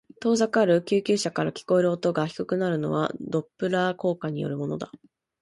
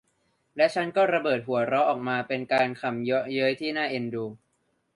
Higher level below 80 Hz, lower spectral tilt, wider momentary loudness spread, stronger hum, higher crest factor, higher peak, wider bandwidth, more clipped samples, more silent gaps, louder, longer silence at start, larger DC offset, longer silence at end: first, -66 dBFS vs -72 dBFS; about the same, -6 dB/octave vs -6 dB/octave; about the same, 9 LU vs 7 LU; neither; about the same, 16 dB vs 18 dB; about the same, -10 dBFS vs -8 dBFS; about the same, 11.5 kHz vs 11.5 kHz; neither; neither; about the same, -25 LUFS vs -26 LUFS; second, 0.2 s vs 0.55 s; neither; second, 0.45 s vs 0.6 s